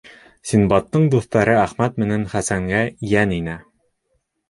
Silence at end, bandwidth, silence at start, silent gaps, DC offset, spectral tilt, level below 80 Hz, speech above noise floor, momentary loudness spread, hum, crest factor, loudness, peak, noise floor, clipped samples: 0.9 s; 11.5 kHz; 0.45 s; none; under 0.1%; -6.5 dB/octave; -44 dBFS; 52 dB; 8 LU; none; 18 dB; -19 LUFS; -2 dBFS; -70 dBFS; under 0.1%